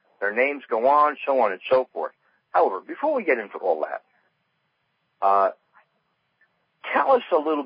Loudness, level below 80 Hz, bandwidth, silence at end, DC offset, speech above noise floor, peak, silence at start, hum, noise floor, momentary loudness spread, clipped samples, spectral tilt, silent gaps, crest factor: -23 LUFS; -76 dBFS; 5.2 kHz; 0 s; under 0.1%; 51 dB; -8 dBFS; 0.2 s; none; -73 dBFS; 10 LU; under 0.1%; -8 dB/octave; none; 16 dB